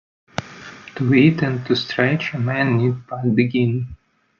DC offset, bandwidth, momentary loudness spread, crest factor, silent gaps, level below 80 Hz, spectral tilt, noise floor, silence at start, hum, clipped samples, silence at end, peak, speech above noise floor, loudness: under 0.1%; 7 kHz; 17 LU; 16 dB; none; -54 dBFS; -7.5 dB/octave; -39 dBFS; 0.4 s; none; under 0.1%; 0.45 s; -2 dBFS; 21 dB; -19 LUFS